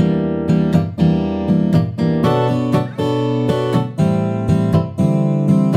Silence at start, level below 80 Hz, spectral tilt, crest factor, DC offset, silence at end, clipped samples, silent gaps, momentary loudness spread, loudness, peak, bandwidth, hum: 0 s; -42 dBFS; -8.5 dB/octave; 14 dB; under 0.1%; 0 s; under 0.1%; none; 4 LU; -17 LUFS; -2 dBFS; 10.5 kHz; none